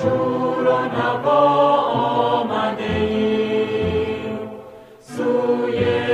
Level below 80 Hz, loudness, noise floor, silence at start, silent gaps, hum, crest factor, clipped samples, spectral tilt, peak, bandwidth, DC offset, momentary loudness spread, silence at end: -50 dBFS; -19 LUFS; -41 dBFS; 0 s; none; none; 14 dB; under 0.1%; -7 dB/octave; -4 dBFS; 11 kHz; under 0.1%; 10 LU; 0 s